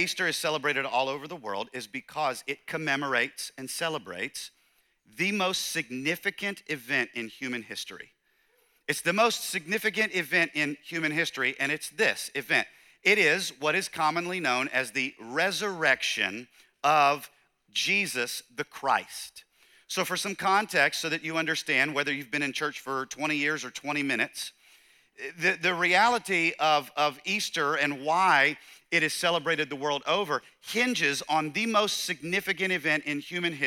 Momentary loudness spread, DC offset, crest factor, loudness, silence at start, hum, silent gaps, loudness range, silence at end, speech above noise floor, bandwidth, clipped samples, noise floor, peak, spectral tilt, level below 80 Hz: 11 LU; under 0.1%; 20 dB; -27 LUFS; 0 s; none; none; 5 LU; 0 s; 40 dB; 18.5 kHz; under 0.1%; -69 dBFS; -8 dBFS; -2.5 dB/octave; -76 dBFS